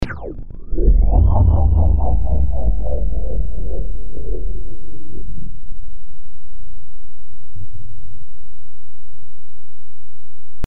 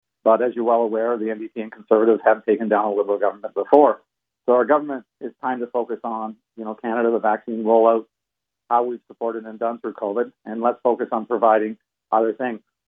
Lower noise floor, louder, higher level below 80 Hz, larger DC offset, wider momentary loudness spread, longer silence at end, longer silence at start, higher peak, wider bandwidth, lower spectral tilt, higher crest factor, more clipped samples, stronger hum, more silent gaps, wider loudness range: second, -47 dBFS vs -84 dBFS; about the same, -20 LUFS vs -21 LUFS; first, -22 dBFS vs -82 dBFS; first, 30% vs under 0.1%; first, 25 LU vs 13 LU; second, 0 s vs 0.3 s; second, 0 s vs 0.25 s; about the same, -2 dBFS vs 0 dBFS; about the same, 4.1 kHz vs 3.8 kHz; about the same, -10.5 dB/octave vs -9.5 dB/octave; about the same, 16 dB vs 20 dB; neither; neither; neither; first, 26 LU vs 4 LU